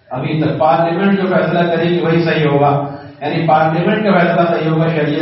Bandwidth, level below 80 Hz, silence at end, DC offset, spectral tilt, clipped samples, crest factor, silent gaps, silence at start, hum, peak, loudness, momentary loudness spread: 5.8 kHz; -54 dBFS; 0 s; under 0.1%; -5.5 dB/octave; under 0.1%; 14 dB; none; 0.1 s; none; 0 dBFS; -14 LUFS; 6 LU